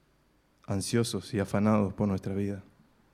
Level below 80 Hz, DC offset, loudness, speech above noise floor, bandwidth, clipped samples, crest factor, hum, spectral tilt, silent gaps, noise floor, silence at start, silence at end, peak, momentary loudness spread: -60 dBFS; under 0.1%; -30 LUFS; 38 dB; 15 kHz; under 0.1%; 18 dB; none; -6 dB/octave; none; -67 dBFS; 0.7 s; 0.55 s; -12 dBFS; 9 LU